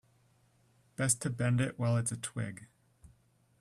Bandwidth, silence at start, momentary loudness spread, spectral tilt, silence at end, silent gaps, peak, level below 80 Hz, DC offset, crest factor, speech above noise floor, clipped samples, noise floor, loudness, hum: 12.5 kHz; 1 s; 12 LU; -5 dB/octave; 0.55 s; none; -14 dBFS; -66 dBFS; under 0.1%; 22 dB; 36 dB; under 0.1%; -69 dBFS; -33 LUFS; none